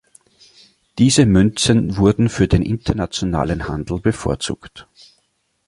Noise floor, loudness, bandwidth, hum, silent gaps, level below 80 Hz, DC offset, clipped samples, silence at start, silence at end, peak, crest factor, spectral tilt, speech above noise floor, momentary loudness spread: -66 dBFS; -17 LUFS; 11.5 kHz; none; none; -34 dBFS; under 0.1%; under 0.1%; 0.95 s; 0.85 s; -2 dBFS; 16 dB; -5.5 dB/octave; 50 dB; 11 LU